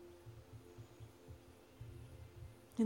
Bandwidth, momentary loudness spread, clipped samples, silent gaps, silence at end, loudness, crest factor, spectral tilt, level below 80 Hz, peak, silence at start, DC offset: 16.5 kHz; 4 LU; under 0.1%; none; 0 s; -57 LUFS; 22 dB; -7.5 dB/octave; -66 dBFS; -26 dBFS; 0 s; under 0.1%